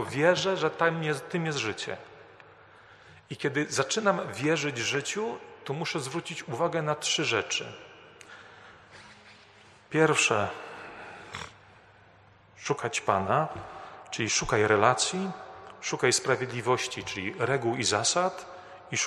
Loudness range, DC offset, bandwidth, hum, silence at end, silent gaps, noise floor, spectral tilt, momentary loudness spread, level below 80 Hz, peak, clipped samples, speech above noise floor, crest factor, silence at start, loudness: 5 LU; under 0.1%; 13 kHz; none; 0 s; none; -57 dBFS; -3.5 dB/octave; 19 LU; -62 dBFS; -6 dBFS; under 0.1%; 29 dB; 24 dB; 0 s; -28 LUFS